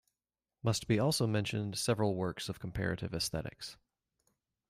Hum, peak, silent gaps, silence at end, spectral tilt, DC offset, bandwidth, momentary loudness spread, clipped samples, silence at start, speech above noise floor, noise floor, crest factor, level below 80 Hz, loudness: none; -18 dBFS; none; 0.95 s; -5 dB/octave; under 0.1%; 15.5 kHz; 10 LU; under 0.1%; 0.65 s; over 56 dB; under -90 dBFS; 18 dB; -58 dBFS; -34 LUFS